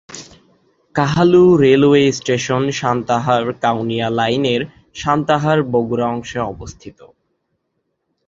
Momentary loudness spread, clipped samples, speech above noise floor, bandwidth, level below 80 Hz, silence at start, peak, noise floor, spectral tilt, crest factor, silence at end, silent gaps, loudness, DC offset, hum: 14 LU; under 0.1%; 56 dB; 7.8 kHz; -48 dBFS; 0.1 s; -2 dBFS; -71 dBFS; -6 dB/octave; 16 dB; 1.4 s; none; -16 LUFS; under 0.1%; none